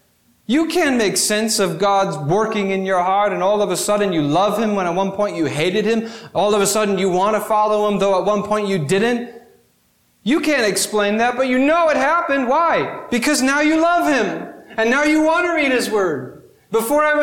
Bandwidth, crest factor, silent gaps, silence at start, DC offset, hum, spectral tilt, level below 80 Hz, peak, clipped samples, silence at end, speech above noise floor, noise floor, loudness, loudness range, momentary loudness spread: 19 kHz; 12 dB; none; 0.5 s; 0.2%; none; -4 dB/octave; -54 dBFS; -4 dBFS; under 0.1%; 0 s; 43 dB; -60 dBFS; -17 LUFS; 3 LU; 6 LU